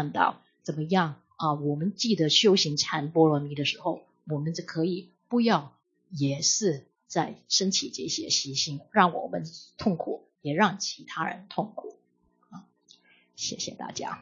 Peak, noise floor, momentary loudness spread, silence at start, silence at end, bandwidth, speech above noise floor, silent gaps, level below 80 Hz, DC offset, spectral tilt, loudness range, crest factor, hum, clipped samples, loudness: -4 dBFS; -69 dBFS; 13 LU; 0 s; 0 s; 7.6 kHz; 42 dB; none; -72 dBFS; under 0.1%; -3.5 dB/octave; 7 LU; 24 dB; none; under 0.1%; -27 LUFS